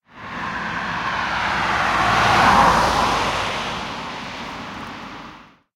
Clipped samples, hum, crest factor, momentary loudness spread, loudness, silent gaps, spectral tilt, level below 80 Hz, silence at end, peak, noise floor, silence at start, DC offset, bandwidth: under 0.1%; none; 20 dB; 19 LU; -19 LUFS; none; -3.5 dB/octave; -40 dBFS; 0.3 s; -2 dBFS; -43 dBFS; 0.15 s; under 0.1%; 16.5 kHz